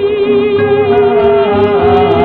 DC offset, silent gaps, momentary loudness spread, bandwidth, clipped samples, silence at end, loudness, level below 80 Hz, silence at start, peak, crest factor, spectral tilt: under 0.1%; none; 2 LU; 4.4 kHz; 0.1%; 0 s; -10 LUFS; -36 dBFS; 0 s; 0 dBFS; 8 dB; -9 dB/octave